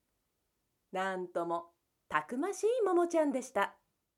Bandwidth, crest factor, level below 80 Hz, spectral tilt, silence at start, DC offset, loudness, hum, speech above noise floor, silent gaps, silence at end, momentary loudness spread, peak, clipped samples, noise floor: 14.5 kHz; 22 dB; -80 dBFS; -4.5 dB/octave; 0.95 s; under 0.1%; -34 LUFS; none; 49 dB; none; 0.45 s; 8 LU; -14 dBFS; under 0.1%; -82 dBFS